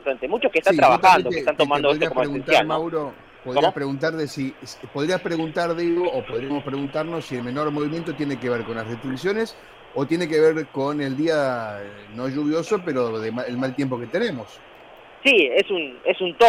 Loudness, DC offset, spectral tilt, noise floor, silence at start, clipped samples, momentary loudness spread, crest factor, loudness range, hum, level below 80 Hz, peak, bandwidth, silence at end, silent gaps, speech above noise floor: -22 LUFS; under 0.1%; -5.5 dB/octave; -45 dBFS; 0 s; under 0.1%; 13 LU; 16 dB; 7 LU; none; -56 dBFS; -6 dBFS; 15.5 kHz; 0 s; none; 24 dB